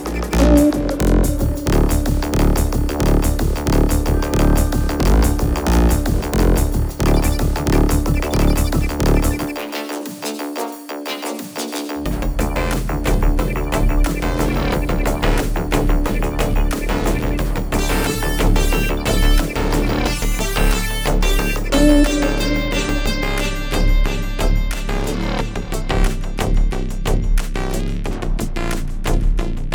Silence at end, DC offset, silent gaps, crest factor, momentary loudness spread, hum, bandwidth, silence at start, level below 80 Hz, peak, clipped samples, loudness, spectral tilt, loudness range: 0 s; under 0.1%; none; 16 dB; 8 LU; none; over 20 kHz; 0 s; -18 dBFS; 0 dBFS; under 0.1%; -19 LUFS; -5.5 dB/octave; 5 LU